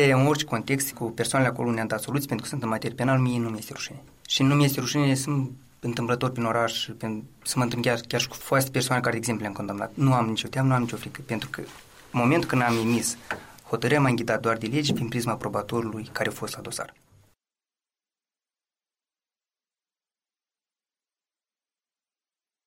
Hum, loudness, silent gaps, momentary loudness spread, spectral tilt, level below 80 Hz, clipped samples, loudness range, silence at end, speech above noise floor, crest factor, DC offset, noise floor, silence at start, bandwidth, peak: none; -26 LUFS; none; 12 LU; -5 dB/octave; -60 dBFS; under 0.1%; 7 LU; 5.75 s; over 65 dB; 18 dB; under 0.1%; under -90 dBFS; 0 s; 16 kHz; -8 dBFS